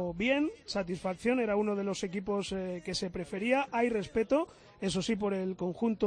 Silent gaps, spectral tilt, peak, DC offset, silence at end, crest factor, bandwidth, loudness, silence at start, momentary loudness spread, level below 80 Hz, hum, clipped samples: none; -5 dB/octave; -16 dBFS; under 0.1%; 0 s; 16 dB; 10.5 kHz; -32 LUFS; 0 s; 6 LU; -58 dBFS; none; under 0.1%